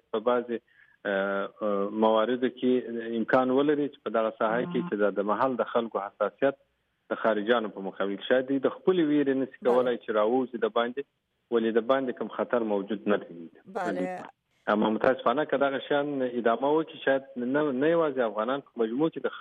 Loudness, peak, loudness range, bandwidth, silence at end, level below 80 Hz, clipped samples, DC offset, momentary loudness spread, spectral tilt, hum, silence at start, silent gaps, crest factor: -28 LUFS; -10 dBFS; 3 LU; 7.6 kHz; 0 s; -76 dBFS; under 0.1%; under 0.1%; 8 LU; -7.5 dB/octave; none; 0.15 s; none; 16 dB